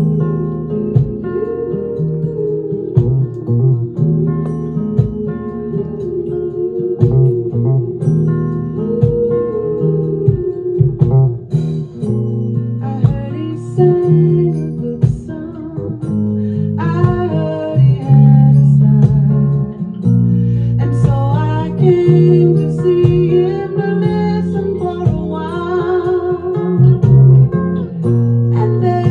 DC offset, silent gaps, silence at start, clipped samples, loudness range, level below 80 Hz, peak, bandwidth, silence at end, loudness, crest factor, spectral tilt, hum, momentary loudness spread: under 0.1%; none; 0 s; under 0.1%; 6 LU; -36 dBFS; 0 dBFS; 4.6 kHz; 0 s; -14 LUFS; 12 dB; -11 dB/octave; none; 10 LU